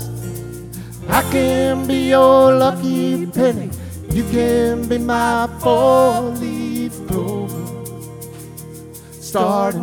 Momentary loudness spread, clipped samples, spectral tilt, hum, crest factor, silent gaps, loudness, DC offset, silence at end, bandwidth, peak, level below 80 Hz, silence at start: 20 LU; under 0.1%; -6 dB/octave; none; 16 dB; none; -16 LUFS; under 0.1%; 0 s; 19 kHz; -2 dBFS; -38 dBFS; 0 s